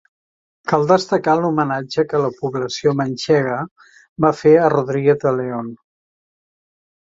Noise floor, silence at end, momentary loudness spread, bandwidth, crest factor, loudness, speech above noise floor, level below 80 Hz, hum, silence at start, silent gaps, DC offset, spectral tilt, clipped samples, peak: under -90 dBFS; 1.3 s; 12 LU; 7.8 kHz; 16 dB; -18 LUFS; over 73 dB; -58 dBFS; none; 0.65 s; 3.71-3.76 s, 4.09-4.16 s; under 0.1%; -6.5 dB/octave; under 0.1%; -2 dBFS